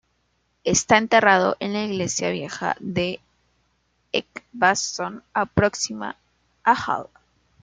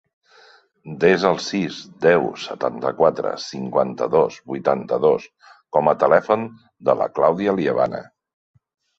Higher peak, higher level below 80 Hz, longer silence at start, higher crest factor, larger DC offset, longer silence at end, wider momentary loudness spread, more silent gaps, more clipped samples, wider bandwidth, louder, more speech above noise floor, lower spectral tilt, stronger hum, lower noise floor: about the same, -2 dBFS vs -2 dBFS; first, -54 dBFS vs -62 dBFS; second, 0.65 s vs 0.85 s; about the same, 22 dB vs 20 dB; neither; second, 0.6 s vs 0.95 s; first, 13 LU vs 9 LU; neither; neither; first, 10 kHz vs 7.8 kHz; about the same, -22 LUFS vs -20 LUFS; first, 47 dB vs 33 dB; second, -3.5 dB/octave vs -6 dB/octave; first, 60 Hz at -50 dBFS vs none; first, -69 dBFS vs -52 dBFS